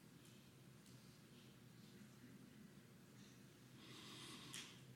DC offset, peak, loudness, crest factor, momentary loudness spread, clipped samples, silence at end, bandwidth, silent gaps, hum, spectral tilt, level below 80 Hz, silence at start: under 0.1%; -38 dBFS; -61 LUFS; 24 dB; 10 LU; under 0.1%; 0 s; 17 kHz; none; none; -3.5 dB/octave; -86 dBFS; 0 s